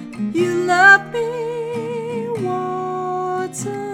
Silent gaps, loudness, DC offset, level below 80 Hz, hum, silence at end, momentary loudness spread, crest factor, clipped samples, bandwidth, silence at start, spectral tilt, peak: none; -18 LUFS; under 0.1%; -64 dBFS; none; 0 s; 15 LU; 18 dB; under 0.1%; 16.5 kHz; 0 s; -4.5 dB/octave; 0 dBFS